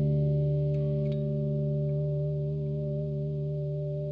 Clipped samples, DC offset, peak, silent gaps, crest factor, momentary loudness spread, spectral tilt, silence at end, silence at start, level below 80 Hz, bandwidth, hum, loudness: under 0.1%; under 0.1%; -18 dBFS; none; 10 dB; 5 LU; -12.5 dB/octave; 0 s; 0 s; -48 dBFS; 4 kHz; none; -30 LUFS